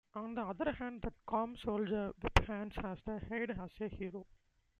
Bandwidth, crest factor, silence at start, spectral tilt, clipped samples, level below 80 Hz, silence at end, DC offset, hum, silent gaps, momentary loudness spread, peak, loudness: 12 kHz; 30 dB; 0.15 s; -6.5 dB/octave; under 0.1%; -48 dBFS; 0.55 s; under 0.1%; none; none; 10 LU; -10 dBFS; -40 LUFS